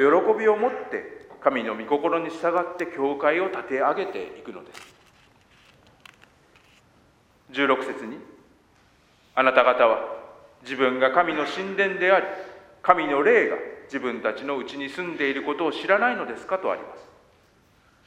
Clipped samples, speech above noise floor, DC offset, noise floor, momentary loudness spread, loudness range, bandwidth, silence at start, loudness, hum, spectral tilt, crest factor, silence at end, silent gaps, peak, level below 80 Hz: under 0.1%; 36 dB; under 0.1%; -59 dBFS; 17 LU; 9 LU; 10.5 kHz; 0 s; -24 LUFS; none; -5 dB/octave; 26 dB; 1 s; none; 0 dBFS; -68 dBFS